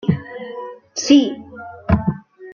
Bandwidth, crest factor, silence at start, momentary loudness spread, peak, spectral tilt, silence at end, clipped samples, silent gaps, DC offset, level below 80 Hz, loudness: 7.2 kHz; 18 dB; 0.05 s; 19 LU; -2 dBFS; -5.5 dB/octave; 0 s; under 0.1%; none; under 0.1%; -38 dBFS; -18 LUFS